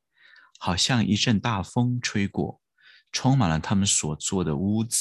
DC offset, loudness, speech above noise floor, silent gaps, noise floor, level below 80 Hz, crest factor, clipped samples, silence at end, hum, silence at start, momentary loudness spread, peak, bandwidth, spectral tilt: under 0.1%; -24 LUFS; 33 dB; none; -57 dBFS; -46 dBFS; 18 dB; under 0.1%; 0 s; none; 0.6 s; 7 LU; -8 dBFS; 12.5 kHz; -4 dB/octave